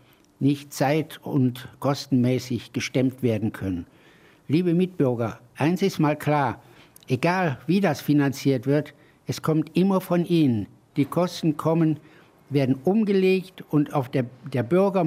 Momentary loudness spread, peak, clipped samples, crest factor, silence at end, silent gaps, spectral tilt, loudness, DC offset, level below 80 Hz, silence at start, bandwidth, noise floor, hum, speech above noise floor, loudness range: 8 LU; -8 dBFS; under 0.1%; 16 dB; 0 s; none; -7 dB/octave; -24 LUFS; under 0.1%; -62 dBFS; 0.4 s; 16 kHz; -54 dBFS; none; 31 dB; 2 LU